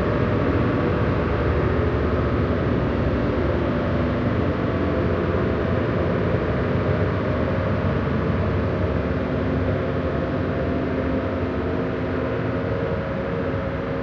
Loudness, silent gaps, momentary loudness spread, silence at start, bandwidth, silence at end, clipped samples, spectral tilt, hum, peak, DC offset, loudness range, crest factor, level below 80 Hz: -23 LUFS; none; 3 LU; 0 s; 6.6 kHz; 0 s; under 0.1%; -9.5 dB/octave; none; -6 dBFS; under 0.1%; 2 LU; 16 dB; -34 dBFS